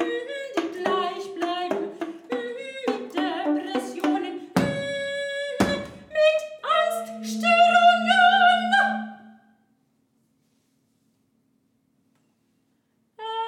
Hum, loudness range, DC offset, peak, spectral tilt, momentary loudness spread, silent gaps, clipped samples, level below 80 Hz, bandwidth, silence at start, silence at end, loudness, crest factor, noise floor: none; 9 LU; under 0.1%; -4 dBFS; -4 dB/octave; 14 LU; none; under 0.1%; -62 dBFS; 16 kHz; 0 s; 0 s; -23 LUFS; 20 dB; -69 dBFS